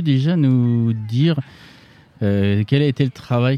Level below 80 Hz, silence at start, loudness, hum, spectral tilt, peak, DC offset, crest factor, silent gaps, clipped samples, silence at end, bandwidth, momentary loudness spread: -56 dBFS; 0 s; -18 LUFS; none; -8.5 dB/octave; -4 dBFS; under 0.1%; 14 dB; none; under 0.1%; 0 s; 6.6 kHz; 7 LU